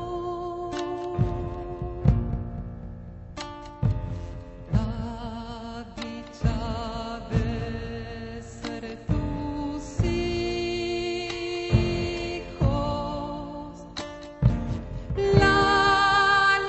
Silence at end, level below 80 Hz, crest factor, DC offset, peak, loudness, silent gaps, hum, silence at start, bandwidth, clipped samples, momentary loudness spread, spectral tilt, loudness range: 0 s; -36 dBFS; 22 dB; under 0.1%; -4 dBFS; -27 LUFS; none; none; 0 s; 8.4 kHz; under 0.1%; 18 LU; -6 dB/octave; 7 LU